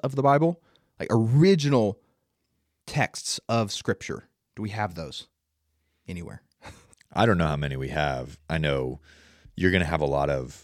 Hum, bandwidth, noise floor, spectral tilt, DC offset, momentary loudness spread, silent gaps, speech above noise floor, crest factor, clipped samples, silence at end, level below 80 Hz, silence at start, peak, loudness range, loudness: none; 15 kHz; -76 dBFS; -6 dB/octave; under 0.1%; 18 LU; none; 51 dB; 20 dB; under 0.1%; 0.05 s; -46 dBFS; 0.05 s; -6 dBFS; 7 LU; -25 LUFS